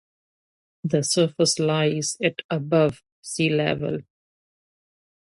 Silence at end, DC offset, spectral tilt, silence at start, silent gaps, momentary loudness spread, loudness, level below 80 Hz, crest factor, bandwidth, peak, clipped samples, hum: 1.2 s; under 0.1%; -4.5 dB/octave; 0.85 s; 2.44-2.49 s, 3.12-3.23 s; 11 LU; -23 LUFS; -62 dBFS; 18 dB; 11.5 kHz; -6 dBFS; under 0.1%; none